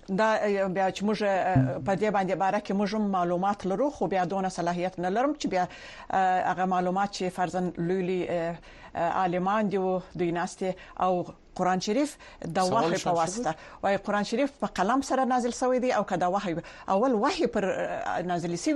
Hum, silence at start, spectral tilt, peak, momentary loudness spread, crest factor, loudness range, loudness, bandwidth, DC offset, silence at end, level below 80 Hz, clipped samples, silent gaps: none; 0.1 s; -5.5 dB/octave; -10 dBFS; 6 LU; 16 dB; 2 LU; -28 LUFS; 11.5 kHz; under 0.1%; 0 s; -56 dBFS; under 0.1%; none